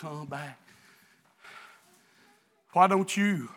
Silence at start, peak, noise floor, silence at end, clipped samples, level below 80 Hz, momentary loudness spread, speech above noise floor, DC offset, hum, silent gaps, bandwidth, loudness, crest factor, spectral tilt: 0 s; -6 dBFS; -64 dBFS; 0.05 s; under 0.1%; -86 dBFS; 26 LU; 37 dB; under 0.1%; none; none; 16.5 kHz; -27 LUFS; 24 dB; -5 dB/octave